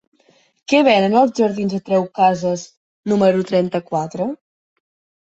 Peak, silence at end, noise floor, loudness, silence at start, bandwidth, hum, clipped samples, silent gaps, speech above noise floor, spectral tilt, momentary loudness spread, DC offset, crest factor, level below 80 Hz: -2 dBFS; 0.85 s; -57 dBFS; -17 LUFS; 0.7 s; 8 kHz; none; under 0.1%; 2.77-3.03 s; 40 dB; -6 dB/octave; 13 LU; under 0.1%; 16 dB; -62 dBFS